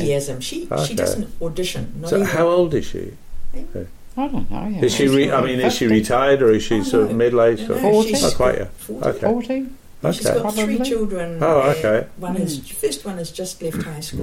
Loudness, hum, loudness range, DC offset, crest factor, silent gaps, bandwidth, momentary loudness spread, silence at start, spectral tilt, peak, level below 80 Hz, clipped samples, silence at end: -19 LUFS; none; 5 LU; under 0.1%; 14 dB; none; 16.5 kHz; 12 LU; 0 s; -5 dB/octave; -4 dBFS; -36 dBFS; under 0.1%; 0 s